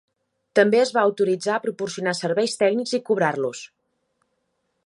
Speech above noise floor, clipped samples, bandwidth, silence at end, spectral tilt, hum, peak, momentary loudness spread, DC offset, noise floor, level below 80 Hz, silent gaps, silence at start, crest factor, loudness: 52 dB; under 0.1%; 11.5 kHz; 1.2 s; -4.5 dB/octave; none; -4 dBFS; 9 LU; under 0.1%; -73 dBFS; -74 dBFS; none; 0.55 s; 20 dB; -22 LUFS